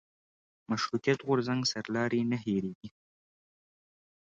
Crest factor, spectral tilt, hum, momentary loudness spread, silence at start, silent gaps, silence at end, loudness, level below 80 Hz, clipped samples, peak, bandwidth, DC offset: 20 dB; -5 dB/octave; none; 10 LU; 0.7 s; 2.75-2.81 s; 1.45 s; -31 LUFS; -70 dBFS; under 0.1%; -14 dBFS; 7.8 kHz; under 0.1%